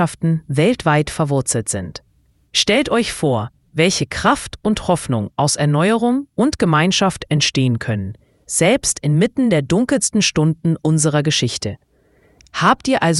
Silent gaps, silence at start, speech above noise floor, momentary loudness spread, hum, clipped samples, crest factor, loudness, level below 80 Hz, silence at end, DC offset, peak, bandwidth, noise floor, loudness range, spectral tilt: none; 0 s; 38 dB; 8 LU; none; under 0.1%; 18 dB; -17 LUFS; -44 dBFS; 0 s; under 0.1%; 0 dBFS; 12 kHz; -55 dBFS; 2 LU; -4.5 dB/octave